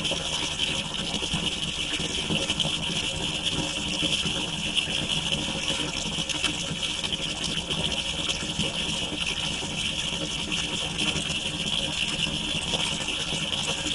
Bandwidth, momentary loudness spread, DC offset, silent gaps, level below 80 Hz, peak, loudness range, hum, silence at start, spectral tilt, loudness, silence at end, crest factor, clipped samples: 11.5 kHz; 2 LU; under 0.1%; none; -44 dBFS; -8 dBFS; 1 LU; none; 0 s; -2 dB/octave; -26 LUFS; 0 s; 20 dB; under 0.1%